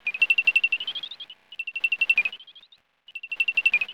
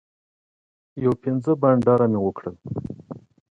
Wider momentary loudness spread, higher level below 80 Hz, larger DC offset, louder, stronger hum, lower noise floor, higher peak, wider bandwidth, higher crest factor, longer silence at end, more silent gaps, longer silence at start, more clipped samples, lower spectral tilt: about the same, 20 LU vs 22 LU; second, -74 dBFS vs -54 dBFS; neither; about the same, -22 LUFS vs -22 LUFS; neither; first, -57 dBFS vs -40 dBFS; second, -10 dBFS vs -6 dBFS; first, 20 kHz vs 7.8 kHz; about the same, 16 dB vs 18 dB; second, 0 s vs 0.35 s; neither; second, 0.05 s vs 0.95 s; neither; second, 1 dB/octave vs -10.5 dB/octave